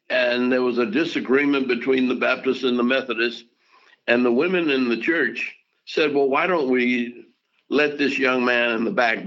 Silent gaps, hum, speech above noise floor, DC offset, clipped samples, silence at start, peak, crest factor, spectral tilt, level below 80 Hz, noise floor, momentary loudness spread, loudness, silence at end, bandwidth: none; none; 36 dB; under 0.1%; under 0.1%; 0.1 s; -4 dBFS; 18 dB; -5.5 dB/octave; -76 dBFS; -56 dBFS; 6 LU; -21 LUFS; 0 s; 7.4 kHz